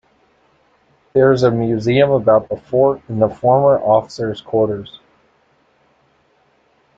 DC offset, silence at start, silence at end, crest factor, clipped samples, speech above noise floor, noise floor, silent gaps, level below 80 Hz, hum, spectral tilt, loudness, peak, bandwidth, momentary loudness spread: under 0.1%; 1.15 s; 2.1 s; 16 dB; under 0.1%; 43 dB; -58 dBFS; none; -52 dBFS; none; -7.5 dB/octave; -15 LUFS; 0 dBFS; 7.8 kHz; 8 LU